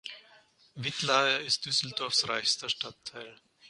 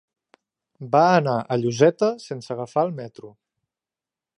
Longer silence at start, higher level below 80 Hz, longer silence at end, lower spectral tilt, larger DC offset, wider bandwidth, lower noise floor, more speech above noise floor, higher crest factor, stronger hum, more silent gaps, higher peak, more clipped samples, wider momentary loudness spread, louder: second, 0.05 s vs 0.8 s; about the same, -74 dBFS vs -70 dBFS; second, 0 s vs 1.1 s; second, -1.5 dB/octave vs -6.5 dB/octave; neither; about the same, 11.5 kHz vs 11 kHz; second, -61 dBFS vs -90 dBFS; second, 30 dB vs 69 dB; about the same, 22 dB vs 20 dB; neither; neither; second, -12 dBFS vs -2 dBFS; neither; about the same, 18 LU vs 17 LU; second, -28 LUFS vs -21 LUFS